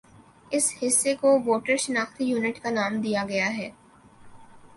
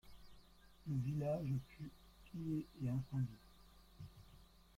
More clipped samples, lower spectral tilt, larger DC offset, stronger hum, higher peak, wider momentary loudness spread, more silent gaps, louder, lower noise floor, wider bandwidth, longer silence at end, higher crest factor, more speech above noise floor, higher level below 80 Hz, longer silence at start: neither; second, -3 dB/octave vs -9 dB/octave; neither; neither; first, -8 dBFS vs -30 dBFS; second, 6 LU vs 24 LU; neither; first, -24 LUFS vs -44 LUFS; second, -50 dBFS vs -64 dBFS; second, 12 kHz vs 15.5 kHz; second, 0.1 s vs 0.3 s; about the same, 18 dB vs 16 dB; first, 26 dB vs 22 dB; about the same, -64 dBFS vs -66 dBFS; first, 0.5 s vs 0.05 s